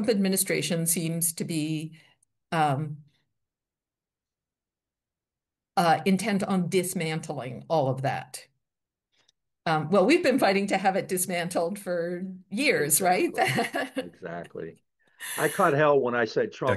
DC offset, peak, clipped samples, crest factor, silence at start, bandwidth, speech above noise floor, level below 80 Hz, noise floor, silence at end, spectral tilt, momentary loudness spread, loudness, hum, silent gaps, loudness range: under 0.1%; -8 dBFS; under 0.1%; 20 dB; 0 s; 12.5 kHz; over 64 dB; -72 dBFS; under -90 dBFS; 0 s; -4.5 dB/octave; 15 LU; -26 LUFS; none; none; 8 LU